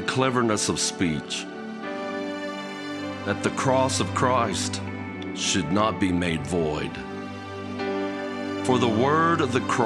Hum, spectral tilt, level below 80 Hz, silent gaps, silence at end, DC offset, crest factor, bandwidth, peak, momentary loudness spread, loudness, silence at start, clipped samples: none; -4.5 dB/octave; -54 dBFS; none; 0 s; under 0.1%; 20 dB; 13 kHz; -6 dBFS; 12 LU; -25 LUFS; 0 s; under 0.1%